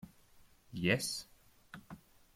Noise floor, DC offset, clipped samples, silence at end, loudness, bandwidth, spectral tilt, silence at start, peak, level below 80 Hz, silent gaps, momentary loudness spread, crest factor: -64 dBFS; under 0.1%; under 0.1%; 0.4 s; -35 LUFS; 16.5 kHz; -4 dB/octave; 0.05 s; -18 dBFS; -68 dBFS; none; 24 LU; 24 dB